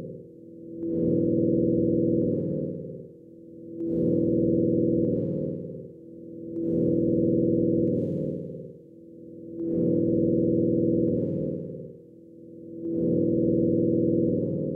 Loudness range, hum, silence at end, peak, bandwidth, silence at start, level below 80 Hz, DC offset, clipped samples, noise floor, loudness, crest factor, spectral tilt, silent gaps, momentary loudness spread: 1 LU; none; 0 s; -12 dBFS; 1 kHz; 0 s; -54 dBFS; under 0.1%; under 0.1%; -48 dBFS; -25 LUFS; 14 dB; -14.5 dB/octave; none; 19 LU